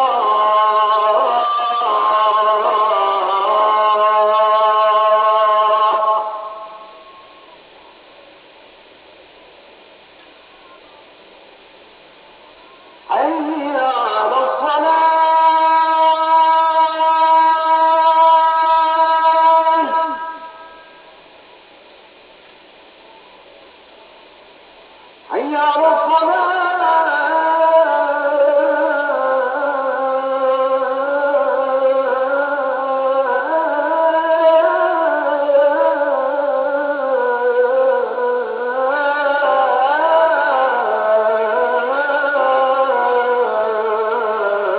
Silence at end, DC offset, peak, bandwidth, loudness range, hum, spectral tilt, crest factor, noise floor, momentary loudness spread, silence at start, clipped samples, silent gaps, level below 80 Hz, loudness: 0 s; under 0.1%; -2 dBFS; 4 kHz; 8 LU; none; -5.5 dB/octave; 14 dB; -44 dBFS; 6 LU; 0 s; under 0.1%; none; -68 dBFS; -15 LUFS